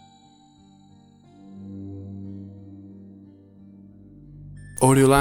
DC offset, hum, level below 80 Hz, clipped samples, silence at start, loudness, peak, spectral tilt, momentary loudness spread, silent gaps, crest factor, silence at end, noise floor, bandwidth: under 0.1%; none; -52 dBFS; under 0.1%; 1.6 s; -22 LUFS; -4 dBFS; -6 dB/octave; 30 LU; none; 24 dB; 0 s; -54 dBFS; 16.5 kHz